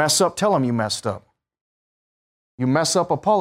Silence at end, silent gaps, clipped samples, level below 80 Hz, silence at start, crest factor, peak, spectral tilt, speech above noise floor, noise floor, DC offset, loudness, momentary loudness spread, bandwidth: 0 s; 1.61-2.58 s; under 0.1%; -62 dBFS; 0 s; 16 dB; -6 dBFS; -4 dB/octave; over 70 dB; under -90 dBFS; under 0.1%; -20 LUFS; 9 LU; 16 kHz